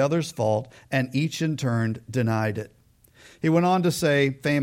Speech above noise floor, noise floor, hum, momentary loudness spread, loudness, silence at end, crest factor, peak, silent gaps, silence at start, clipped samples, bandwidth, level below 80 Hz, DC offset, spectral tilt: 32 dB; -55 dBFS; none; 7 LU; -24 LUFS; 0 s; 16 dB; -8 dBFS; none; 0 s; under 0.1%; 16.5 kHz; -60 dBFS; under 0.1%; -6 dB/octave